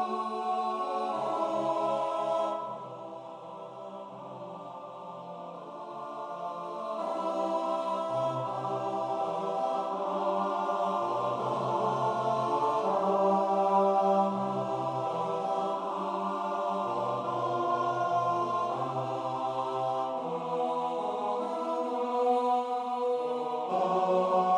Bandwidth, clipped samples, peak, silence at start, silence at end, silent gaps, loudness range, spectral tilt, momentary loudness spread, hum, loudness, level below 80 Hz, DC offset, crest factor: 10.5 kHz; under 0.1%; -14 dBFS; 0 s; 0 s; none; 10 LU; -6.5 dB/octave; 16 LU; none; -30 LUFS; -78 dBFS; under 0.1%; 16 dB